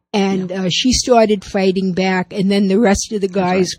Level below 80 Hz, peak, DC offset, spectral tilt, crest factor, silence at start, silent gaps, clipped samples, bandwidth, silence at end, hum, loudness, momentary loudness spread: -38 dBFS; 0 dBFS; under 0.1%; -4.5 dB/octave; 16 dB; 0.15 s; none; under 0.1%; 14 kHz; 0.05 s; none; -15 LUFS; 5 LU